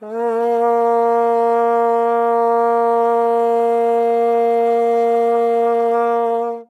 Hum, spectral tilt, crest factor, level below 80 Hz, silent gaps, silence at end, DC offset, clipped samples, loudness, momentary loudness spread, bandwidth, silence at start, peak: none; -5.5 dB/octave; 10 dB; under -90 dBFS; none; 0.05 s; under 0.1%; under 0.1%; -16 LUFS; 1 LU; 9.2 kHz; 0 s; -6 dBFS